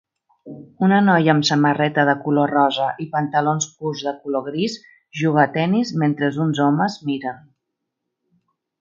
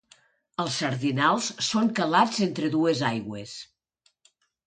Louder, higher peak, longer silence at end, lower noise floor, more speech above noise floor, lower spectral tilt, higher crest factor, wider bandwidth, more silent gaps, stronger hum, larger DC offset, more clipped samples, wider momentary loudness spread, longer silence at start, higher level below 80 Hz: first, -19 LUFS vs -25 LUFS; first, 0 dBFS vs -6 dBFS; first, 1.4 s vs 1.05 s; first, -79 dBFS vs -70 dBFS; first, 60 dB vs 45 dB; about the same, -5.5 dB/octave vs -4.5 dB/octave; about the same, 20 dB vs 20 dB; second, 7.6 kHz vs 9.6 kHz; neither; neither; neither; neither; second, 10 LU vs 15 LU; second, 0.45 s vs 0.6 s; about the same, -68 dBFS vs -68 dBFS